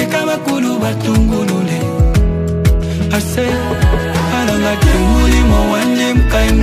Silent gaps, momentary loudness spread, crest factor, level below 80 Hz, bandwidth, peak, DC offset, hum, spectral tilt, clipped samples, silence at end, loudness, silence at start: none; 5 LU; 12 dB; -16 dBFS; 15.5 kHz; 0 dBFS; under 0.1%; none; -6 dB/octave; under 0.1%; 0 s; -14 LUFS; 0 s